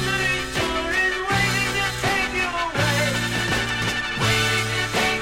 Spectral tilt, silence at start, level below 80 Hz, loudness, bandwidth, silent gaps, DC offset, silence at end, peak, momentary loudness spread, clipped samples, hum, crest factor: -3.5 dB/octave; 0 s; -40 dBFS; -21 LUFS; 16.5 kHz; none; under 0.1%; 0 s; -8 dBFS; 3 LU; under 0.1%; none; 14 dB